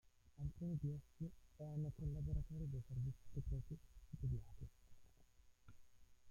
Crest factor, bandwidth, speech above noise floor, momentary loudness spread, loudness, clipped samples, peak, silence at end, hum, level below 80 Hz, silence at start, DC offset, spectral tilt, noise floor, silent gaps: 16 dB; 10.5 kHz; 22 dB; 11 LU; -49 LUFS; under 0.1%; -32 dBFS; 0 s; none; -56 dBFS; 0.05 s; under 0.1%; -9.5 dB/octave; -69 dBFS; none